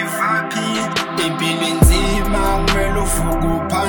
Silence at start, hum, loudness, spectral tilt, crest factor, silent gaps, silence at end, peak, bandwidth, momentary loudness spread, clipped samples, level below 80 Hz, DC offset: 0 s; none; -17 LUFS; -4.5 dB/octave; 16 dB; none; 0 s; -2 dBFS; 17.5 kHz; 6 LU; under 0.1%; -22 dBFS; under 0.1%